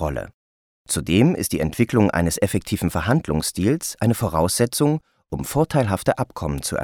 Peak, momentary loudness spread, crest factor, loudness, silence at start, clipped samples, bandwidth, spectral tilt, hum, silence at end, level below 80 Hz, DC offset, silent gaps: -4 dBFS; 8 LU; 16 dB; -21 LUFS; 0 s; under 0.1%; 19 kHz; -5.5 dB/octave; none; 0 s; -40 dBFS; under 0.1%; 0.34-0.85 s